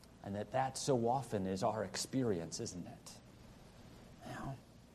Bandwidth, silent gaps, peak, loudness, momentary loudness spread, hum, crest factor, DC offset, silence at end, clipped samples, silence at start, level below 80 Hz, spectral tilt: 13 kHz; none; -22 dBFS; -39 LUFS; 23 LU; none; 18 dB; under 0.1%; 0.05 s; under 0.1%; 0 s; -66 dBFS; -5 dB/octave